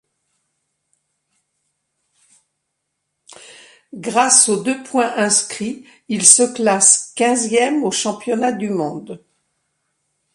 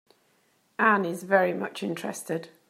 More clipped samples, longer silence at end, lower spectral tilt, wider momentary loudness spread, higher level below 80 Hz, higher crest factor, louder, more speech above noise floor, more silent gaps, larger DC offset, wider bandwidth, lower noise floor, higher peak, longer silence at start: neither; first, 1.2 s vs 0.2 s; second, -2 dB/octave vs -5 dB/octave; first, 16 LU vs 11 LU; first, -68 dBFS vs -82 dBFS; about the same, 20 dB vs 22 dB; first, -15 LUFS vs -26 LUFS; first, 58 dB vs 41 dB; neither; neither; about the same, 15.5 kHz vs 16 kHz; first, -75 dBFS vs -67 dBFS; first, 0 dBFS vs -6 dBFS; first, 3.5 s vs 0.8 s